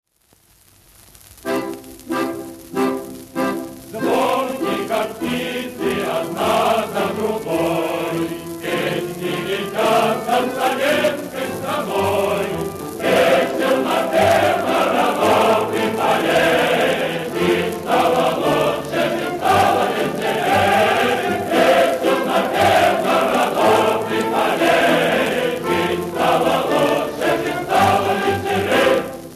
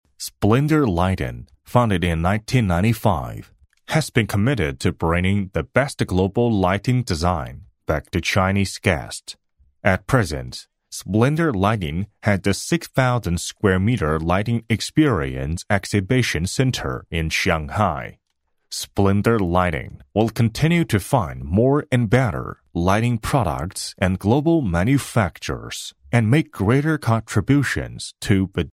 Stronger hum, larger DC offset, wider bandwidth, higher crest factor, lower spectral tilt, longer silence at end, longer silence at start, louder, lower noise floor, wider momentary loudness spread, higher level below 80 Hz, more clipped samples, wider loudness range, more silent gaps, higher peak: neither; neither; second, 14 kHz vs 16 kHz; second, 14 dB vs 20 dB; second, -4.5 dB/octave vs -6 dB/octave; about the same, 0 s vs 0.05 s; first, 1.45 s vs 0.2 s; first, -18 LUFS vs -21 LUFS; second, -56 dBFS vs -70 dBFS; about the same, 9 LU vs 10 LU; second, -52 dBFS vs -38 dBFS; neither; first, 6 LU vs 2 LU; neither; second, -4 dBFS vs 0 dBFS